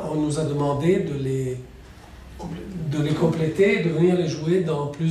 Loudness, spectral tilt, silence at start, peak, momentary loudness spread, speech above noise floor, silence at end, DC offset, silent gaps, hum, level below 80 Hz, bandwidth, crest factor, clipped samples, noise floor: -23 LUFS; -7 dB/octave; 0 s; -8 dBFS; 15 LU; 22 dB; 0 s; under 0.1%; none; none; -48 dBFS; 12.5 kHz; 16 dB; under 0.1%; -43 dBFS